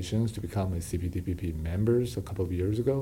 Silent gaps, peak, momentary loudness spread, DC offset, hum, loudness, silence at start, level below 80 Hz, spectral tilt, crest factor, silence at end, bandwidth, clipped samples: none; -16 dBFS; 6 LU; under 0.1%; none; -31 LUFS; 0 s; -42 dBFS; -7.5 dB/octave; 14 dB; 0 s; 17 kHz; under 0.1%